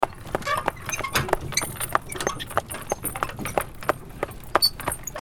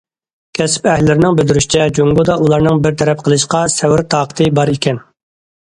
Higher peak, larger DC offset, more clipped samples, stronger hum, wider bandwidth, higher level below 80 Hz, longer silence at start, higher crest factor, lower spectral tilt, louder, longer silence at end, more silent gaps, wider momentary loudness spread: about the same, 0 dBFS vs 0 dBFS; neither; neither; neither; first, 19 kHz vs 11 kHz; about the same, -42 dBFS vs -38 dBFS; second, 0 s vs 0.55 s; first, 28 dB vs 12 dB; second, -2.5 dB/octave vs -5 dB/octave; second, -26 LUFS vs -12 LUFS; second, 0 s vs 0.7 s; neither; first, 9 LU vs 5 LU